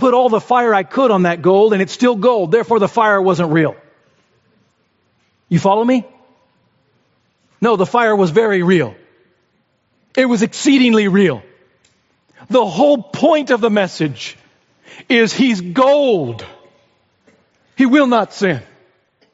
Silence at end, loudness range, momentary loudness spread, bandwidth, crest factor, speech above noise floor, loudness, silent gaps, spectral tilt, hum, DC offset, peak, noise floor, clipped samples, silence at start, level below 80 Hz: 0.7 s; 5 LU; 7 LU; 8 kHz; 16 dB; 49 dB; -14 LUFS; none; -4.5 dB/octave; none; under 0.1%; 0 dBFS; -62 dBFS; under 0.1%; 0 s; -64 dBFS